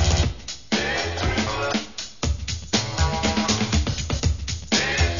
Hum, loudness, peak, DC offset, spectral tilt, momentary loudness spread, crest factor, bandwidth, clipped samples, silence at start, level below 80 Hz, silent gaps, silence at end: none; -24 LUFS; -6 dBFS; 0.6%; -4 dB/octave; 7 LU; 16 dB; 7.4 kHz; under 0.1%; 0 s; -30 dBFS; none; 0 s